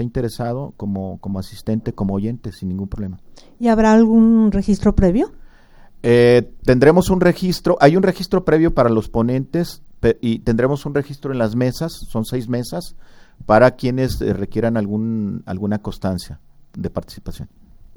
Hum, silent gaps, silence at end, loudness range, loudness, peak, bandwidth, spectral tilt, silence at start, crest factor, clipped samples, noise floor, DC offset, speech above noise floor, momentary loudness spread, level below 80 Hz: none; none; 0.5 s; 8 LU; -18 LUFS; 0 dBFS; 17.5 kHz; -7.5 dB/octave; 0 s; 18 dB; under 0.1%; -43 dBFS; under 0.1%; 26 dB; 15 LU; -34 dBFS